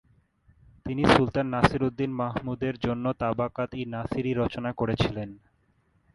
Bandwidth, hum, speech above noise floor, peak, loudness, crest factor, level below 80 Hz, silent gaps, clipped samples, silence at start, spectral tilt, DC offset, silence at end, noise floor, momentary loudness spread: 11.5 kHz; none; 41 dB; -4 dBFS; -27 LUFS; 24 dB; -48 dBFS; none; under 0.1%; 0.85 s; -7 dB/octave; under 0.1%; 0.8 s; -67 dBFS; 11 LU